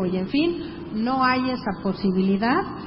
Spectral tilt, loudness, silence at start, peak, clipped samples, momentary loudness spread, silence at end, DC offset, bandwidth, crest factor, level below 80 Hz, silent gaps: -11 dB/octave; -23 LUFS; 0 s; -6 dBFS; under 0.1%; 7 LU; 0 s; under 0.1%; 5.8 kHz; 16 dB; -50 dBFS; none